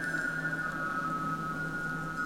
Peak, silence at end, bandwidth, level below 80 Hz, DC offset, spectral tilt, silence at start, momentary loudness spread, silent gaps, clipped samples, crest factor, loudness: -22 dBFS; 0 s; 16.5 kHz; -56 dBFS; under 0.1%; -5.5 dB/octave; 0 s; 3 LU; none; under 0.1%; 12 dB; -33 LUFS